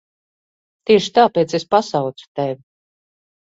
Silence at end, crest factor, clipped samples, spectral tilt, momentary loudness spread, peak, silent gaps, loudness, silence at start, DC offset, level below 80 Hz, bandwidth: 0.95 s; 18 dB; under 0.1%; -5 dB/octave; 12 LU; 0 dBFS; 2.28-2.35 s; -17 LUFS; 0.9 s; under 0.1%; -62 dBFS; 7.8 kHz